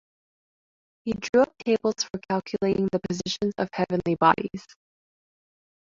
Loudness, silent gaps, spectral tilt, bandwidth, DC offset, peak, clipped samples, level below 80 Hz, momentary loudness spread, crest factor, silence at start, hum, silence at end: -25 LUFS; 1.29-1.33 s; -5 dB/octave; 7.8 kHz; under 0.1%; -4 dBFS; under 0.1%; -58 dBFS; 10 LU; 22 dB; 1.05 s; none; 1.35 s